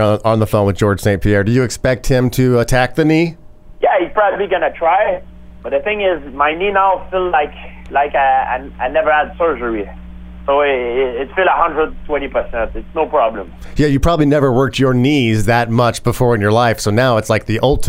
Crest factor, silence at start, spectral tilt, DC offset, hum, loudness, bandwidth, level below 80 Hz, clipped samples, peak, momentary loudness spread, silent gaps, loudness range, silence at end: 14 dB; 0 s; -6 dB/octave; under 0.1%; none; -15 LUFS; 16 kHz; -30 dBFS; under 0.1%; 0 dBFS; 8 LU; none; 3 LU; 0 s